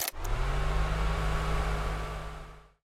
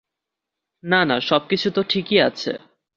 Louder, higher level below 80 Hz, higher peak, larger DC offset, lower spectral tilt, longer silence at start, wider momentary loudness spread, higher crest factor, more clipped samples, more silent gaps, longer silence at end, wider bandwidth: second, -33 LUFS vs -20 LUFS; first, -32 dBFS vs -62 dBFS; second, -12 dBFS vs -2 dBFS; neither; about the same, -4.5 dB/octave vs -5.5 dB/octave; second, 0 s vs 0.85 s; about the same, 11 LU vs 11 LU; about the same, 18 dB vs 20 dB; neither; neither; second, 0.25 s vs 0.4 s; first, 16 kHz vs 7.2 kHz